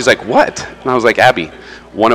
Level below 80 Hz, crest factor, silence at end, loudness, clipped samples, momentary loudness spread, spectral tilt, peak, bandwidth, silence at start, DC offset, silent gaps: -44 dBFS; 12 dB; 0 s; -12 LUFS; 0.3%; 14 LU; -4 dB/octave; 0 dBFS; 16 kHz; 0 s; under 0.1%; none